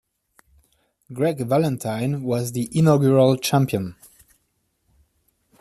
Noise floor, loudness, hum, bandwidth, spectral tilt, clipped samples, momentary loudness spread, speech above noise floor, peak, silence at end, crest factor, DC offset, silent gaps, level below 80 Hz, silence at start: -71 dBFS; -20 LUFS; none; 14.5 kHz; -6.5 dB/octave; under 0.1%; 9 LU; 51 dB; -4 dBFS; 1.7 s; 18 dB; under 0.1%; none; -58 dBFS; 1.1 s